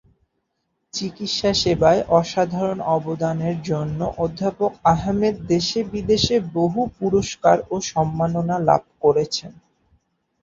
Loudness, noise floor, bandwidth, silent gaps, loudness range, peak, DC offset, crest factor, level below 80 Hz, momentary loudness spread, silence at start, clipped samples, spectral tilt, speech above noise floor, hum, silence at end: -21 LUFS; -74 dBFS; 7.8 kHz; none; 2 LU; -2 dBFS; under 0.1%; 18 dB; -46 dBFS; 7 LU; 0.95 s; under 0.1%; -5.5 dB/octave; 54 dB; none; 0.9 s